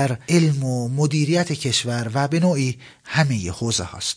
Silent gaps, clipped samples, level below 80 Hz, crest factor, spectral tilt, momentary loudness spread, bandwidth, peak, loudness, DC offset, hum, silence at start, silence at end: none; under 0.1%; -52 dBFS; 16 dB; -5 dB/octave; 5 LU; 10.5 kHz; -4 dBFS; -21 LUFS; under 0.1%; none; 0 s; 0 s